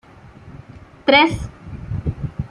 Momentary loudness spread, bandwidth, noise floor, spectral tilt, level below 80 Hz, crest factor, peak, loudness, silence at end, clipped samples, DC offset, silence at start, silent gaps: 21 LU; 11.5 kHz; -42 dBFS; -6 dB/octave; -38 dBFS; 20 dB; -2 dBFS; -18 LUFS; 0.05 s; under 0.1%; under 0.1%; 0.25 s; none